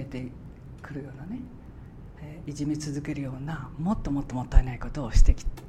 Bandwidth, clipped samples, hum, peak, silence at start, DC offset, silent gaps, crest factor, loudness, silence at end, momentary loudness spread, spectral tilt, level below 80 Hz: 9 kHz; under 0.1%; none; -4 dBFS; 0 s; under 0.1%; none; 24 dB; -31 LUFS; 0 s; 19 LU; -6.5 dB/octave; -28 dBFS